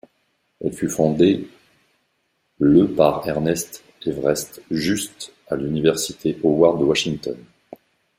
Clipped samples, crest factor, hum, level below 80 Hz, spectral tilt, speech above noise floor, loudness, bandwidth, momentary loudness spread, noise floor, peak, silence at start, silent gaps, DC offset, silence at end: under 0.1%; 20 dB; none; -52 dBFS; -5 dB/octave; 50 dB; -20 LUFS; 16 kHz; 13 LU; -70 dBFS; -2 dBFS; 0.6 s; none; under 0.1%; 0.8 s